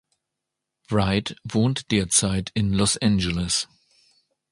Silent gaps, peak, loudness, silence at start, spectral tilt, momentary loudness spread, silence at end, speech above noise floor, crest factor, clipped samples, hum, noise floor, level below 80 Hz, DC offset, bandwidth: none; -6 dBFS; -22 LUFS; 0.9 s; -4 dB/octave; 6 LU; 0.85 s; 61 dB; 18 dB; under 0.1%; none; -83 dBFS; -42 dBFS; under 0.1%; 11.5 kHz